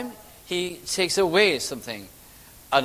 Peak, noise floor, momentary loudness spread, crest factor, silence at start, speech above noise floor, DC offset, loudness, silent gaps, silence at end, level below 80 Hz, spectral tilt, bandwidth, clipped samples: -4 dBFS; -48 dBFS; 18 LU; 22 dB; 0 s; 24 dB; under 0.1%; -23 LUFS; none; 0 s; -56 dBFS; -2.5 dB/octave; 16 kHz; under 0.1%